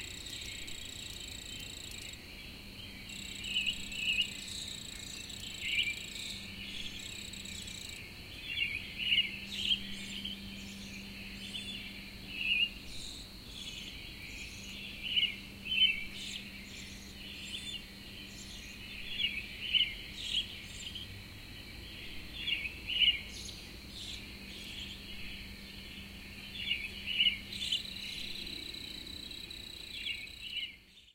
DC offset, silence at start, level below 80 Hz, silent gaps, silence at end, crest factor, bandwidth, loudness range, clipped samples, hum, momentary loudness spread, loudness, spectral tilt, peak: under 0.1%; 0 s; -54 dBFS; none; 0 s; 24 dB; 17 kHz; 6 LU; under 0.1%; none; 16 LU; -36 LUFS; -1.5 dB/octave; -16 dBFS